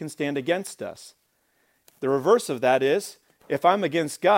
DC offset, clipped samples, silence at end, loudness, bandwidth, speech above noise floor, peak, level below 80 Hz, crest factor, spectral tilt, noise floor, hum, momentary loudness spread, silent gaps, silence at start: under 0.1%; under 0.1%; 0 s; -24 LUFS; 16.5 kHz; 45 dB; -4 dBFS; -74 dBFS; 20 dB; -4.5 dB/octave; -68 dBFS; none; 16 LU; none; 0 s